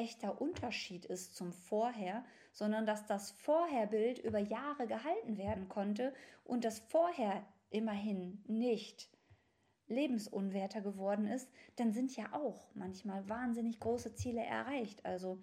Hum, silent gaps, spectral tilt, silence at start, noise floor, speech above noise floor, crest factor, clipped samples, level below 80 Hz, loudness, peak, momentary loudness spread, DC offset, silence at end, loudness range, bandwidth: none; none; -5.5 dB/octave; 0 s; -77 dBFS; 38 dB; 16 dB; under 0.1%; -70 dBFS; -40 LUFS; -24 dBFS; 9 LU; under 0.1%; 0 s; 3 LU; 15 kHz